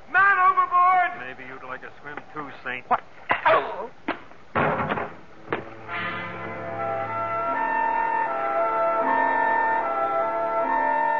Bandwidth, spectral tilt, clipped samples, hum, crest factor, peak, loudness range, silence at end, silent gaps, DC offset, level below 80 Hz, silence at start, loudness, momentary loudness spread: 6.8 kHz; -6.5 dB/octave; under 0.1%; none; 16 dB; -8 dBFS; 6 LU; 0 s; none; 0.6%; -62 dBFS; 0.1 s; -24 LUFS; 17 LU